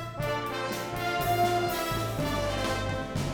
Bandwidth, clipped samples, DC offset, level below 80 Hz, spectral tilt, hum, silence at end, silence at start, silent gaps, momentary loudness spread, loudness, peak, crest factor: over 20 kHz; under 0.1%; under 0.1%; -44 dBFS; -5 dB/octave; none; 0 s; 0 s; none; 6 LU; -29 LUFS; -14 dBFS; 14 dB